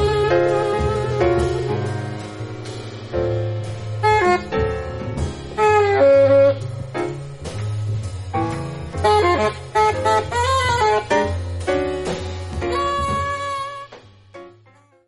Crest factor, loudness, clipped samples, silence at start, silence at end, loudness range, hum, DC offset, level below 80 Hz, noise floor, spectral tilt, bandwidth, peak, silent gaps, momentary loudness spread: 16 dB; -20 LUFS; under 0.1%; 0 s; 0.6 s; 6 LU; none; under 0.1%; -36 dBFS; -52 dBFS; -6 dB/octave; 11.5 kHz; -4 dBFS; none; 13 LU